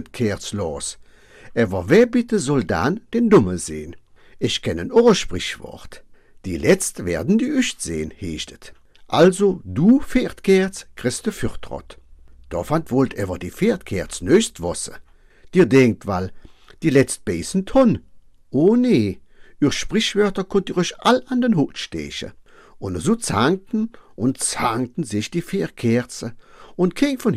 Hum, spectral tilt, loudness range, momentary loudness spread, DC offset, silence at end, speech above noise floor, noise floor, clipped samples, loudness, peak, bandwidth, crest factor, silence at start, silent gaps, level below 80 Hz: none; -5 dB/octave; 4 LU; 14 LU; under 0.1%; 0 s; 25 dB; -44 dBFS; under 0.1%; -20 LUFS; -4 dBFS; 15 kHz; 16 dB; 0 s; none; -44 dBFS